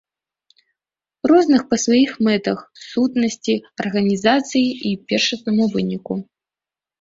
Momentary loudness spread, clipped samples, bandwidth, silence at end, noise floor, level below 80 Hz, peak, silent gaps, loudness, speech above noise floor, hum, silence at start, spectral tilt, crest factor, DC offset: 10 LU; under 0.1%; 7.8 kHz; 0.8 s; -90 dBFS; -60 dBFS; -2 dBFS; none; -19 LUFS; 72 dB; none; 1.25 s; -4.5 dB/octave; 18 dB; under 0.1%